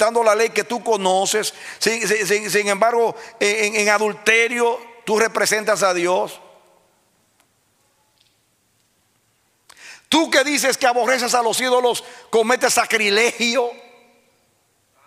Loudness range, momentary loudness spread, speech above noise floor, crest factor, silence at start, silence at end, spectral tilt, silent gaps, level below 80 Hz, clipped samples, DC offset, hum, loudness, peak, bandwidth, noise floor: 6 LU; 6 LU; 45 dB; 18 dB; 0 s; 1.25 s; -1.5 dB/octave; none; -68 dBFS; under 0.1%; under 0.1%; none; -18 LUFS; -2 dBFS; 16 kHz; -63 dBFS